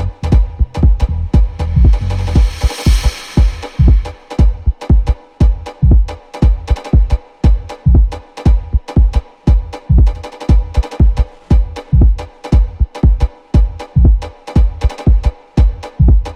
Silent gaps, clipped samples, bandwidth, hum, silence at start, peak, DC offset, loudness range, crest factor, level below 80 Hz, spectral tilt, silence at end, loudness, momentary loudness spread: none; under 0.1%; 9.6 kHz; none; 0 s; 0 dBFS; under 0.1%; 1 LU; 12 dB; -12 dBFS; -7.5 dB/octave; 0 s; -14 LUFS; 5 LU